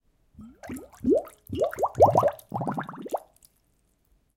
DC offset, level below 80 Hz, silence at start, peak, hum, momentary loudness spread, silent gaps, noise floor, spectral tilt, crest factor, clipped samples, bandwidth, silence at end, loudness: under 0.1%; -58 dBFS; 0.4 s; -6 dBFS; none; 21 LU; none; -68 dBFS; -7.5 dB/octave; 22 dB; under 0.1%; 17 kHz; 1.15 s; -26 LUFS